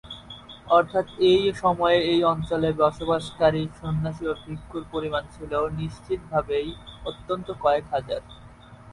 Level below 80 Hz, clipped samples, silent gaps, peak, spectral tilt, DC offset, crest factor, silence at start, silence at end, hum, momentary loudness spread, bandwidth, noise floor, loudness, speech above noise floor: -48 dBFS; under 0.1%; none; -6 dBFS; -6.5 dB/octave; under 0.1%; 18 dB; 0.05 s; 0 s; none; 15 LU; 11.5 kHz; -46 dBFS; -24 LUFS; 22 dB